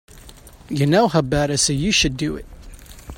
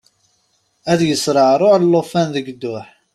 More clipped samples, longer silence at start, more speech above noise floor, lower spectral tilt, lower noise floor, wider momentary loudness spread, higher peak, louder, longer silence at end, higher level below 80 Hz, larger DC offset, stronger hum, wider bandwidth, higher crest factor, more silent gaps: neither; second, 0.15 s vs 0.85 s; second, 24 dB vs 48 dB; second, -4 dB/octave vs -5.5 dB/octave; second, -43 dBFS vs -63 dBFS; second, 11 LU vs 15 LU; about the same, -2 dBFS vs -2 dBFS; second, -18 LUFS vs -15 LUFS; second, 0 s vs 0.3 s; first, -38 dBFS vs -58 dBFS; neither; neither; first, 16.5 kHz vs 13.5 kHz; about the same, 18 dB vs 14 dB; neither